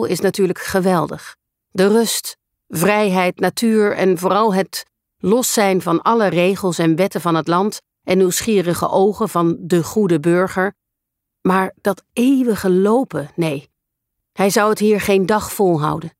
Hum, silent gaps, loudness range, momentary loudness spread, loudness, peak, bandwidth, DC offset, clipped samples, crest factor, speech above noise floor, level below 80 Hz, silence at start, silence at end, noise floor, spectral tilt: none; none; 2 LU; 8 LU; -17 LUFS; -2 dBFS; 16 kHz; under 0.1%; under 0.1%; 14 dB; 63 dB; -54 dBFS; 0 s; 0.1 s; -79 dBFS; -5 dB/octave